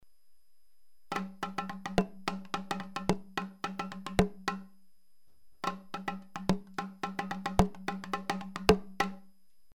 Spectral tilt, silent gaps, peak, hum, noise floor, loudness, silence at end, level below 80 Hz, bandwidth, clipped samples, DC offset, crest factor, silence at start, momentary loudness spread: -5.5 dB/octave; none; -8 dBFS; none; -69 dBFS; -35 LUFS; 0.4 s; -50 dBFS; 17.5 kHz; under 0.1%; 0.3%; 28 dB; 0 s; 10 LU